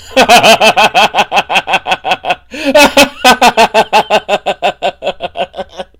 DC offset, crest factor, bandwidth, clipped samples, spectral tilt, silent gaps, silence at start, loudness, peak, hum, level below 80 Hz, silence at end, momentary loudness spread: under 0.1%; 10 dB; over 20 kHz; 3%; -2 dB/octave; none; 0.05 s; -8 LUFS; 0 dBFS; none; -40 dBFS; 0.15 s; 14 LU